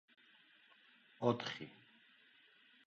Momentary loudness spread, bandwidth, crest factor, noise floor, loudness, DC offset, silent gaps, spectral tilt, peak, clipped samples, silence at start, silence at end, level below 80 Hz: 28 LU; 7.6 kHz; 28 dB; -68 dBFS; -41 LUFS; under 0.1%; none; -4.5 dB/octave; -18 dBFS; under 0.1%; 1.2 s; 1.1 s; -86 dBFS